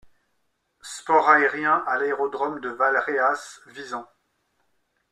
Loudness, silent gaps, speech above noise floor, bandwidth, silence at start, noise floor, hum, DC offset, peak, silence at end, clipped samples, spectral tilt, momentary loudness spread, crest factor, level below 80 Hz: -22 LUFS; none; 51 dB; 13 kHz; 0.85 s; -73 dBFS; none; under 0.1%; -2 dBFS; 1.05 s; under 0.1%; -3.5 dB/octave; 18 LU; 22 dB; -72 dBFS